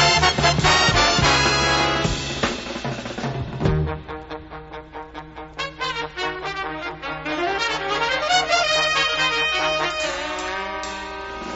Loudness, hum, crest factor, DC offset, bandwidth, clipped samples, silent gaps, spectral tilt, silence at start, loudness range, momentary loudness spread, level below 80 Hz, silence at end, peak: -20 LUFS; none; 20 dB; under 0.1%; 8.2 kHz; under 0.1%; none; -3 dB/octave; 0 s; 10 LU; 18 LU; -38 dBFS; 0 s; -2 dBFS